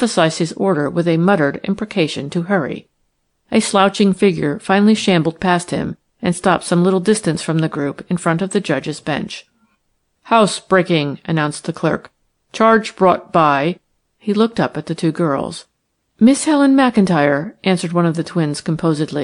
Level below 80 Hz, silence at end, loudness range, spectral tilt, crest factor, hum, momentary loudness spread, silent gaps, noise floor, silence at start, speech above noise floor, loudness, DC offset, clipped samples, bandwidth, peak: -54 dBFS; 0 s; 3 LU; -5.5 dB/octave; 16 dB; none; 9 LU; none; -68 dBFS; 0 s; 53 dB; -16 LUFS; under 0.1%; under 0.1%; 11 kHz; -2 dBFS